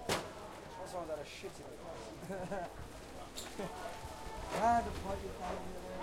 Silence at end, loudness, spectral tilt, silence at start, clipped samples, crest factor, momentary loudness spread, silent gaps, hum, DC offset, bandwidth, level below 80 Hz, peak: 0 s; -41 LUFS; -4.5 dB/octave; 0 s; under 0.1%; 20 dB; 14 LU; none; none; under 0.1%; 16.5 kHz; -54 dBFS; -20 dBFS